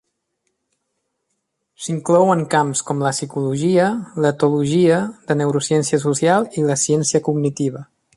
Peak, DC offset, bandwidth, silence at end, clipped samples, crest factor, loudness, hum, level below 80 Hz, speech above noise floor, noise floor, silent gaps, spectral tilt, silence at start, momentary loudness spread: -2 dBFS; under 0.1%; 11.5 kHz; 0.35 s; under 0.1%; 16 dB; -18 LUFS; none; -60 dBFS; 56 dB; -74 dBFS; none; -5 dB/octave; 1.8 s; 7 LU